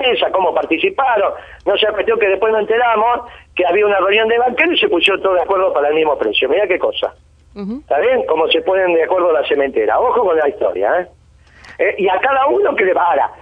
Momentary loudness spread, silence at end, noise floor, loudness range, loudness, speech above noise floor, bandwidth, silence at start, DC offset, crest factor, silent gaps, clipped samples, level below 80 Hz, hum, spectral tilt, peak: 6 LU; 0.05 s; -44 dBFS; 2 LU; -14 LUFS; 30 dB; 9.4 kHz; 0 s; under 0.1%; 14 dB; none; under 0.1%; -48 dBFS; none; -5 dB/octave; 0 dBFS